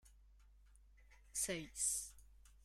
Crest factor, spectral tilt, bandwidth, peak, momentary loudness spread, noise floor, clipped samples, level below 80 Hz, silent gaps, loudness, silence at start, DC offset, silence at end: 22 dB; -1.5 dB/octave; 16 kHz; -26 dBFS; 8 LU; -66 dBFS; under 0.1%; -64 dBFS; none; -41 LUFS; 0.05 s; under 0.1%; 0.25 s